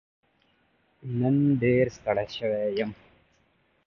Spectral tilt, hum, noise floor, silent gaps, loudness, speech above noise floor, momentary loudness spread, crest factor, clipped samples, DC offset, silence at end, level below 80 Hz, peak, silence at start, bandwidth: -8 dB/octave; none; -68 dBFS; none; -26 LUFS; 42 dB; 11 LU; 18 dB; under 0.1%; under 0.1%; 0.95 s; -58 dBFS; -10 dBFS; 1.05 s; 7 kHz